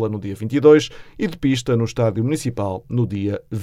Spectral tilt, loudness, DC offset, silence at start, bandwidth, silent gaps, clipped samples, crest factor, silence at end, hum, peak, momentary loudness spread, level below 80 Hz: -6.5 dB/octave; -20 LUFS; under 0.1%; 0 s; 13.5 kHz; none; under 0.1%; 18 dB; 0 s; none; -2 dBFS; 13 LU; -48 dBFS